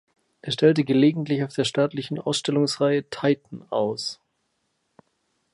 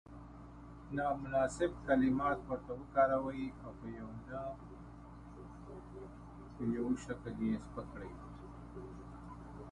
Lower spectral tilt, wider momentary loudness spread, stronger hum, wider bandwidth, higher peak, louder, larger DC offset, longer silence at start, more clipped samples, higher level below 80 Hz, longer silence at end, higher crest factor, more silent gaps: second, -5.5 dB/octave vs -7 dB/octave; second, 11 LU vs 21 LU; neither; about the same, 11.5 kHz vs 11 kHz; first, -4 dBFS vs -18 dBFS; first, -23 LUFS vs -37 LUFS; neither; first, 0.45 s vs 0.05 s; neither; second, -70 dBFS vs -56 dBFS; first, 1.4 s vs 0 s; about the same, 20 dB vs 22 dB; neither